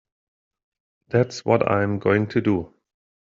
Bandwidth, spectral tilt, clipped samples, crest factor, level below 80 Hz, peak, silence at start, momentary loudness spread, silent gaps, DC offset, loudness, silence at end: 7.6 kHz; -6.5 dB/octave; under 0.1%; 20 dB; -60 dBFS; -4 dBFS; 1.1 s; 5 LU; none; under 0.1%; -22 LUFS; 0.55 s